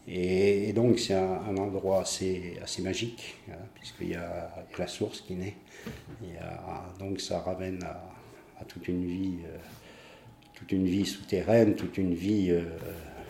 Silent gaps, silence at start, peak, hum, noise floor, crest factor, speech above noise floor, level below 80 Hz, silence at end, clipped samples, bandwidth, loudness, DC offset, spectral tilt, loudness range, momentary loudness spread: none; 0.05 s; -10 dBFS; none; -53 dBFS; 22 dB; 22 dB; -60 dBFS; 0 s; under 0.1%; 16.5 kHz; -31 LUFS; under 0.1%; -5.5 dB/octave; 9 LU; 20 LU